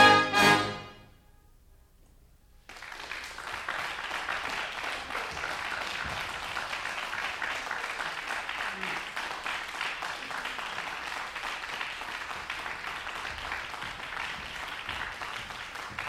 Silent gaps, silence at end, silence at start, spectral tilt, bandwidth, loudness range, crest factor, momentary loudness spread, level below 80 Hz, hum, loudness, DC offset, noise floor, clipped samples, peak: none; 0 s; 0 s; -2.5 dB/octave; 16.5 kHz; 3 LU; 26 dB; 5 LU; -58 dBFS; none; -32 LUFS; under 0.1%; -58 dBFS; under 0.1%; -6 dBFS